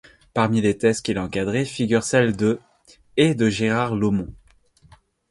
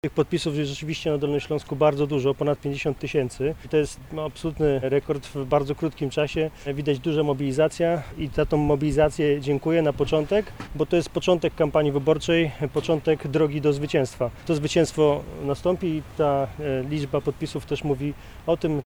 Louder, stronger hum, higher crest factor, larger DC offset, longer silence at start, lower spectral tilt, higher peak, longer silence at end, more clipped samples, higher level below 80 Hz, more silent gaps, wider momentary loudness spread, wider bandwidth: first, -21 LUFS vs -24 LUFS; neither; about the same, 18 dB vs 16 dB; neither; first, 0.35 s vs 0.05 s; about the same, -5.5 dB/octave vs -6.5 dB/octave; about the same, -4 dBFS vs -6 dBFS; first, 0.95 s vs 0.05 s; neither; second, -50 dBFS vs -44 dBFS; neither; about the same, 8 LU vs 7 LU; second, 11.5 kHz vs 17 kHz